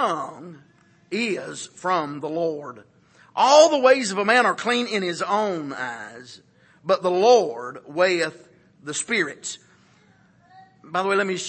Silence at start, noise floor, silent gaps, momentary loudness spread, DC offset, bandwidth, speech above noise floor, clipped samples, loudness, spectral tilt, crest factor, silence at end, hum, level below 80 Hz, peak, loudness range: 0 s; -57 dBFS; none; 19 LU; under 0.1%; 8.8 kHz; 35 dB; under 0.1%; -21 LUFS; -3 dB/octave; 20 dB; 0 s; none; -76 dBFS; -2 dBFS; 8 LU